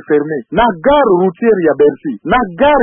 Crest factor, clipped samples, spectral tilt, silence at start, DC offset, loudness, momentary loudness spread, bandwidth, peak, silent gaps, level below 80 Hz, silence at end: 12 dB; under 0.1%; -12 dB/octave; 0.1 s; under 0.1%; -12 LUFS; 5 LU; 3.7 kHz; 0 dBFS; none; -38 dBFS; 0 s